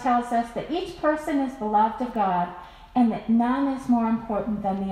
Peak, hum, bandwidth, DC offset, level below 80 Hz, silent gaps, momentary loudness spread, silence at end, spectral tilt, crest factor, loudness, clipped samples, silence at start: -10 dBFS; none; 12 kHz; under 0.1%; -50 dBFS; none; 7 LU; 0 s; -7 dB/octave; 14 dB; -25 LUFS; under 0.1%; 0 s